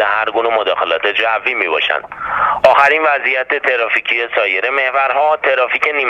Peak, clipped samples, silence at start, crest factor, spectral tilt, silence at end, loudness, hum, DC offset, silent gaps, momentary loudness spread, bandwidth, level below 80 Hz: 0 dBFS; under 0.1%; 0 s; 14 dB; -3 dB/octave; 0 s; -13 LUFS; none; under 0.1%; none; 5 LU; 9.8 kHz; -52 dBFS